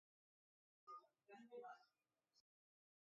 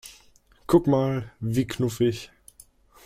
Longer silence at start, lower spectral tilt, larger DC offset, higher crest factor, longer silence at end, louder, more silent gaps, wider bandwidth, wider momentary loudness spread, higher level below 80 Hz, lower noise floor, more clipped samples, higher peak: first, 0.85 s vs 0.05 s; second, -2.5 dB/octave vs -7 dB/octave; neither; about the same, 20 dB vs 20 dB; second, 0.65 s vs 0.8 s; second, -62 LUFS vs -24 LUFS; neither; second, 7 kHz vs 15.5 kHz; second, 7 LU vs 23 LU; second, under -90 dBFS vs -52 dBFS; first, under -90 dBFS vs -57 dBFS; neither; second, -48 dBFS vs -6 dBFS